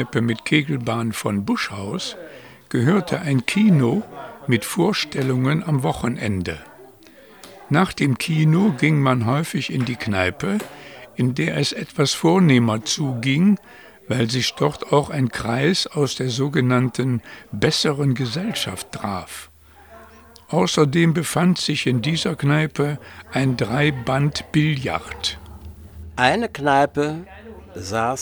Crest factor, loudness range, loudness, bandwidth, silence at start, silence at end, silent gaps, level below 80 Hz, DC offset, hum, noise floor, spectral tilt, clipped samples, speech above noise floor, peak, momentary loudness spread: 20 dB; 3 LU; -20 LUFS; over 20 kHz; 0 s; 0 s; none; -52 dBFS; under 0.1%; none; -47 dBFS; -5.5 dB/octave; under 0.1%; 27 dB; 0 dBFS; 12 LU